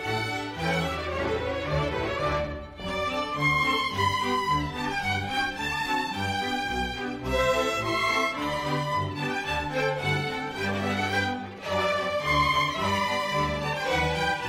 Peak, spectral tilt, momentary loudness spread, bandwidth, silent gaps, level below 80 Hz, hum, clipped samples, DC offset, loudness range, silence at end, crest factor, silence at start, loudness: -12 dBFS; -4.5 dB/octave; 6 LU; 16 kHz; none; -44 dBFS; none; under 0.1%; under 0.1%; 2 LU; 0 s; 16 dB; 0 s; -27 LUFS